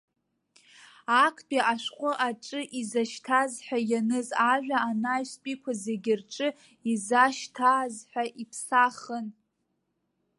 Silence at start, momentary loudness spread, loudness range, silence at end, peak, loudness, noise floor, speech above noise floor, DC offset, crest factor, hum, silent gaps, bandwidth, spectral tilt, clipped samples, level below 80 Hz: 1.1 s; 12 LU; 2 LU; 1.05 s; -8 dBFS; -28 LUFS; -78 dBFS; 50 dB; under 0.1%; 20 dB; none; none; 11.5 kHz; -3 dB/octave; under 0.1%; -82 dBFS